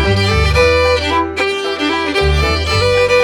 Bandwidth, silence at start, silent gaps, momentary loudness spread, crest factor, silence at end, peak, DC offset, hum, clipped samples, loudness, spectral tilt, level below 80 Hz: 16.5 kHz; 0 s; none; 5 LU; 14 dB; 0 s; 0 dBFS; under 0.1%; none; under 0.1%; -13 LUFS; -5 dB/octave; -22 dBFS